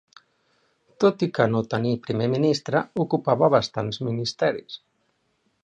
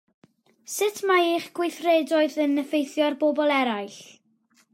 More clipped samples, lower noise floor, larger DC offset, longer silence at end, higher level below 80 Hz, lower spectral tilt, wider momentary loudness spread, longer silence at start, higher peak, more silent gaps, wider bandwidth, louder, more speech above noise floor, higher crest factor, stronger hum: neither; first, -70 dBFS vs -64 dBFS; neither; first, 0.9 s vs 0.7 s; first, -62 dBFS vs -86 dBFS; first, -6.5 dB/octave vs -2.5 dB/octave; about the same, 8 LU vs 10 LU; first, 1 s vs 0.7 s; first, -4 dBFS vs -10 dBFS; neither; second, 9.4 kHz vs 16 kHz; about the same, -23 LUFS vs -24 LUFS; first, 47 dB vs 41 dB; about the same, 20 dB vs 16 dB; neither